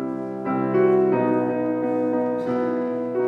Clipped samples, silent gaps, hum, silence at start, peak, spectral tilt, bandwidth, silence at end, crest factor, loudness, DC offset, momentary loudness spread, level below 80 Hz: under 0.1%; none; none; 0 s; -8 dBFS; -9.5 dB/octave; 5.2 kHz; 0 s; 14 dB; -22 LUFS; under 0.1%; 7 LU; -68 dBFS